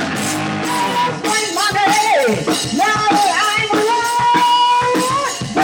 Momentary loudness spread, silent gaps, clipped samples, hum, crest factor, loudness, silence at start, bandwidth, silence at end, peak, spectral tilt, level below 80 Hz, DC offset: 6 LU; none; under 0.1%; none; 12 dB; -15 LUFS; 0 s; 18 kHz; 0 s; -2 dBFS; -3 dB/octave; -52 dBFS; under 0.1%